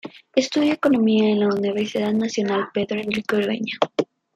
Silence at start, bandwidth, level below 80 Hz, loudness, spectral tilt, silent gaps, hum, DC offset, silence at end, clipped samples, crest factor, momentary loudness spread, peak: 0.05 s; 10.5 kHz; -64 dBFS; -21 LUFS; -5.5 dB/octave; none; none; under 0.1%; 0.3 s; under 0.1%; 18 dB; 7 LU; -2 dBFS